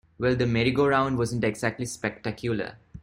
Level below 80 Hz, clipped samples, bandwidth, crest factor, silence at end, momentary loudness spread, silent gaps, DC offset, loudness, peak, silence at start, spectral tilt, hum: -52 dBFS; under 0.1%; 16 kHz; 18 dB; 0.05 s; 9 LU; none; under 0.1%; -26 LUFS; -8 dBFS; 0.2 s; -6 dB/octave; none